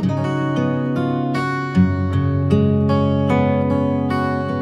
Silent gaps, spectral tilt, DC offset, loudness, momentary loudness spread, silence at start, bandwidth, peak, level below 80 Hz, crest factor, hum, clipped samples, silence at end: none; -8.5 dB/octave; under 0.1%; -19 LUFS; 4 LU; 0 s; 9.6 kHz; -2 dBFS; -52 dBFS; 16 dB; none; under 0.1%; 0 s